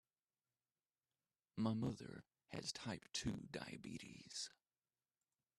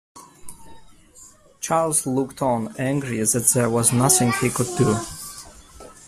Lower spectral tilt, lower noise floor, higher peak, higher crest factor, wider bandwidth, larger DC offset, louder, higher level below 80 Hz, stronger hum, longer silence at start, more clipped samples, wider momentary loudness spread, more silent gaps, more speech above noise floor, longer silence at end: about the same, -4.5 dB/octave vs -4.5 dB/octave; first, under -90 dBFS vs -49 dBFS; second, -28 dBFS vs -2 dBFS; about the same, 22 dB vs 22 dB; second, 13 kHz vs 15.5 kHz; neither; second, -48 LUFS vs -20 LUFS; second, -74 dBFS vs -50 dBFS; neither; first, 1.55 s vs 0.15 s; neither; second, 12 LU vs 16 LU; neither; first, over 43 dB vs 28 dB; first, 1.1 s vs 0.15 s